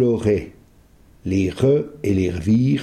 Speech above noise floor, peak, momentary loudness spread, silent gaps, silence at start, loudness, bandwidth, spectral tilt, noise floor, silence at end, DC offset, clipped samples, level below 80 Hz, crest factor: 32 dB; -4 dBFS; 6 LU; none; 0 s; -20 LUFS; 12.5 kHz; -8 dB/octave; -51 dBFS; 0 s; under 0.1%; under 0.1%; -44 dBFS; 14 dB